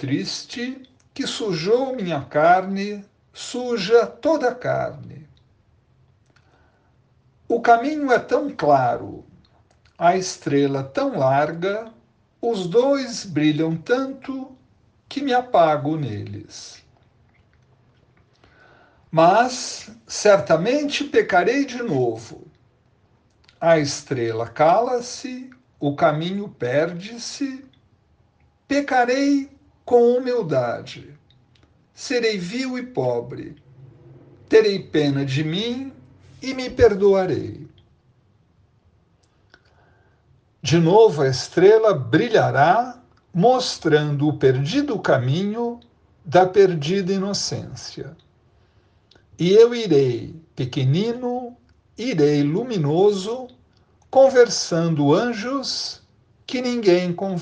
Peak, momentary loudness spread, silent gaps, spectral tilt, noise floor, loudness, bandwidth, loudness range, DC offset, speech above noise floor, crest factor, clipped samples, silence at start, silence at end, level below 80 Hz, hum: -2 dBFS; 17 LU; none; -5.5 dB/octave; -60 dBFS; -20 LUFS; 9.6 kHz; 6 LU; under 0.1%; 41 dB; 18 dB; under 0.1%; 0 s; 0 s; -56 dBFS; none